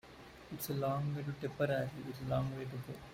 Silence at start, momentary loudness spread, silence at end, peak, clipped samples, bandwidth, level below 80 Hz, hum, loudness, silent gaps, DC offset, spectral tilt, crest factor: 0.05 s; 12 LU; 0 s; -20 dBFS; under 0.1%; 16 kHz; -64 dBFS; none; -39 LUFS; none; under 0.1%; -6.5 dB/octave; 18 dB